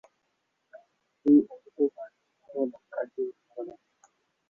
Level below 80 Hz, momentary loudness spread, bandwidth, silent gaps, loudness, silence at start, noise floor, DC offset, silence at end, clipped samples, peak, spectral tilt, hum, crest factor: -78 dBFS; 20 LU; 2.2 kHz; none; -28 LUFS; 0.75 s; -77 dBFS; under 0.1%; 0.8 s; under 0.1%; -10 dBFS; -9 dB/octave; none; 20 dB